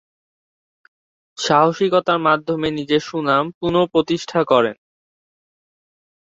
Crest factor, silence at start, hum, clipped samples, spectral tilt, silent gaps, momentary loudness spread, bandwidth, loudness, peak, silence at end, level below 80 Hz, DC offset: 18 dB; 1.4 s; none; under 0.1%; -5 dB/octave; 3.54-3.61 s; 6 LU; 8 kHz; -18 LUFS; -2 dBFS; 1.55 s; -56 dBFS; under 0.1%